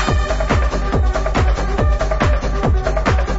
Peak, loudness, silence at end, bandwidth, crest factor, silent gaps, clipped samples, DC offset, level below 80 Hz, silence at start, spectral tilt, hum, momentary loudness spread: -4 dBFS; -18 LUFS; 0 s; 8 kHz; 12 dB; none; under 0.1%; under 0.1%; -18 dBFS; 0 s; -6 dB/octave; none; 1 LU